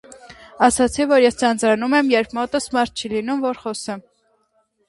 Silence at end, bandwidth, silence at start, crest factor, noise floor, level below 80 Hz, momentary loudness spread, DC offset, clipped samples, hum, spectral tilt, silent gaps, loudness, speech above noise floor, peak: 0.9 s; 11.5 kHz; 0.1 s; 20 dB; -65 dBFS; -50 dBFS; 12 LU; under 0.1%; under 0.1%; none; -3.5 dB/octave; none; -19 LUFS; 46 dB; 0 dBFS